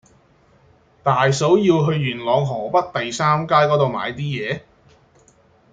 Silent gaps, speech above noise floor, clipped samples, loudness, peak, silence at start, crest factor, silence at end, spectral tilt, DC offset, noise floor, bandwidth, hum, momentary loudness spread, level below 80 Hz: none; 37 dB; under 0.1%; -19 LUFS; -2 dBFS; 1.05 s; 18 dB; 1.15 s; -6 dB/octave; under 0.1%; -55 dBFS; 9.2 kHz; none; 10 LU; -56 dBFS